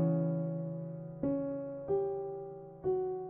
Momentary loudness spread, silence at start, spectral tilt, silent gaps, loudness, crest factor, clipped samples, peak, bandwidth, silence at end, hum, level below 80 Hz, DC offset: 9 LU; 0 s; -13 dB/octave; none; -36 LUFS; 14 dB; under 0.1%; -22 dBFS; 2.5 kHz; 0 s; none; -66 dBFS; under 0.1%